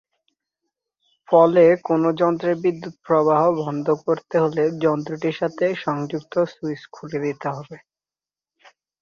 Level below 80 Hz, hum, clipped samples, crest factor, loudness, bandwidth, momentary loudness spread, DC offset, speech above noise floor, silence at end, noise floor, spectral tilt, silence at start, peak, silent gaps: -66 dBFS; none; under 0.1%; 18 dB; -20 LUFS; 7 kHz; 14 LU; under 0.1%; over 70 dB; 1.25 s; under -90 dBFS; -8 dB/octave; 1.3 s; -2 dBFS; none